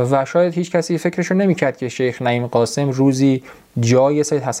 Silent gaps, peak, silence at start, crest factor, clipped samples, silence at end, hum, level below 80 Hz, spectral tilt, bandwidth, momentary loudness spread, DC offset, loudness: none; -2 dBFS; 0 s; 16 dB; under 0.1%; 0 s; none; -60 dBFS; -6 dB/octave; 15 kHz; 6 LU; under 0.1%; -17 LUFS